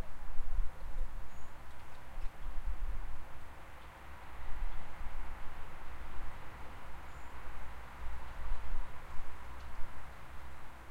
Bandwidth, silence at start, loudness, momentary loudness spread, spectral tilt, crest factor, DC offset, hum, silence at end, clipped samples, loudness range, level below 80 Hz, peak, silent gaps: 4.6 kHz; 0 s; -49 LUFS; 8 LU; -5.5 dB/octave; 14 dB; under 0.1%; none; 0 s; under 0.1%; 2 LU; -42 dBFS; -18 dBFS; none